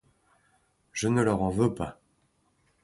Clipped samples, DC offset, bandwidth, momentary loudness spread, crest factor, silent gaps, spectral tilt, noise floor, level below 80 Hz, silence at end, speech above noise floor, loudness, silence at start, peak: under 0.1%; under 0.1%; 11.5 kHz; 13 LU; 20 dB; none; -6 dB/octave; -70 dBFS; -52 dBFS; 0.9 s; 44 dB; -28 LUFS; 0.95 s; -10 dBFS